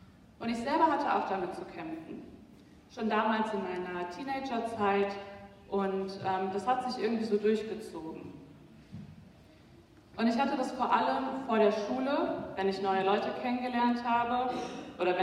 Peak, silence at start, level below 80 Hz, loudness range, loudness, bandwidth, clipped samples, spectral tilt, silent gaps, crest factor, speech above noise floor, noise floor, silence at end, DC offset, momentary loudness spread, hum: -14 dBFS; 0.4 s; -66 dBFS; 5 LU; -32 LUFS; 12 kHz; under 0.1%; -6 dB/octave; none; 18 dB; 26 dB; -57 dBFS; 0 s; under 0.1%; 18 LU; none